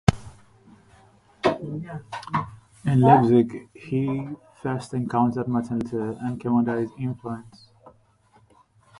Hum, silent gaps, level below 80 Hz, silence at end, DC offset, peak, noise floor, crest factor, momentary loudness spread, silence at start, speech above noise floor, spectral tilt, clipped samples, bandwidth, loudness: none; none; -48 dBFS; 1.1 s; under 0.1%; 0 dBFS; -59 dBFS; 24 dB; 18 LU; 0.1 s; 36 dB; -8 dB/octave; under 0.1%; 11.5 kHz; -24 LUFS